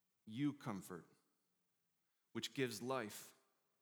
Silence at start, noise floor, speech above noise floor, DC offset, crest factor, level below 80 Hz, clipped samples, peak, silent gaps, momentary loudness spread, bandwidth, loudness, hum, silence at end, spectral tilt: 0.25 s; -87 dBFS; 41 dB; under 0.1%; 22 dB; under -90 dBFS; under 0.1%; -26 dBFS; none; 12 LU; over 20 kHz; -46 LUFS; none; 0.5 s; -4.5 dB/octave